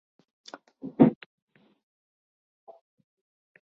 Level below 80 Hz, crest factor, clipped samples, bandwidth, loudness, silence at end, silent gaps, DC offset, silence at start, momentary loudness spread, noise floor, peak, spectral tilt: -68 dBFS; 26 dB; under 0.1%; 7 kHz; -23 LUFS; 2.5 s; none; under 0.1%; 0.85 s; 26 LU; -44 dBFS; -4 dBFS; -8.5 dB/octave